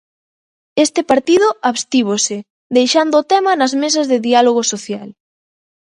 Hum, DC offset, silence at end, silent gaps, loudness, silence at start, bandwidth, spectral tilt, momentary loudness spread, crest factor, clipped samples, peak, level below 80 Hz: none; under 0.1%; 0.85 s; 2.50-2.70 s; -14 LUFS; 0.75 s; 11.5 kHz; -2.5 dB/octave; 9 LU; 16 dB; under 0.1%; 0 dBFS; -62 dBFS